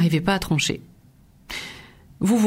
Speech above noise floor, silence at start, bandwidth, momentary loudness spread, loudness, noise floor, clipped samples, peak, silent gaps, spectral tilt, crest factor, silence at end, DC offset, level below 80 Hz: 32 dB; 0 s; 16 kHz; 15 LU; -24 LUFS; -53 dBFS; under 0.1%; -6 dBFS; none; -5 dB/octave; 18 dB; 0 s; under 0.1%; -46 dBFS